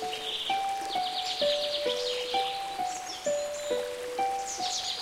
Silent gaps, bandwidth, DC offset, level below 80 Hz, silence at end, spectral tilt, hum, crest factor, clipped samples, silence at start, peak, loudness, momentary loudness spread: none; 16.5 kHz; under 0.1%; -66 dBFS; 0 s; -0.5 dB/octave; none; 16 dB; under 0.1%; 0 s; -16 dBFS; -30 LUFS; 5 LU